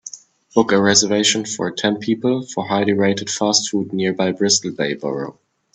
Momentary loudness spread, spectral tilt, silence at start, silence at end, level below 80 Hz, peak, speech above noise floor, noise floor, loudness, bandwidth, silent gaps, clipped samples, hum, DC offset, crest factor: 10 LU; -3 dB/octave; 0.05 s; 0.45 s; -60 dBFS; 0 dBFS; 21 dB; -39 dBFS; -18 LUFS; 9.4 kHz; none; under 0.1%; none; under 0.1%; 18 dB